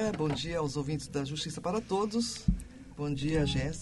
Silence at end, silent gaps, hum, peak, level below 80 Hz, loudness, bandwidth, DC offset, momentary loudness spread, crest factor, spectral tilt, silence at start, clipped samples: 0 s; none; none; -12 dBFS; -44 dBFS; -33 LUFS; 11.5 kHz; under 0.1%; 6 LU; 20 dB; -5.5 dB/octave; 0 s; under 0.1%